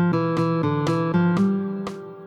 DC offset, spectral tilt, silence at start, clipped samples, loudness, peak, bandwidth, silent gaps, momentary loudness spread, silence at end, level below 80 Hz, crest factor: under 0.1%; -8.5 dB/octave; 0 s; under 0.1%; -22 LUFS; -10 dBFS; 9 kHz; none; 9 LU; 0 s; -58 dBFS; 12 dB